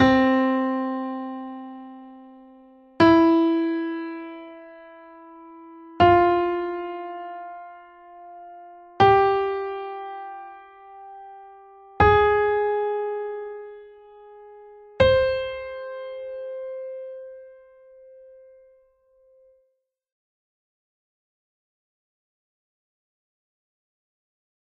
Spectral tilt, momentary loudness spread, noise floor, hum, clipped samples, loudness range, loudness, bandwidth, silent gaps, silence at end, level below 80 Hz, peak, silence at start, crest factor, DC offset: -7.5 dB/octave; 26 LU; -73 dBFS; none; under 0.1%; 9 LU; -22 LUFS; 6.6 kHz; none; 7.25 s; -48 dBFS; -4 dBFS; 0 s; 20 dB; under 0.1%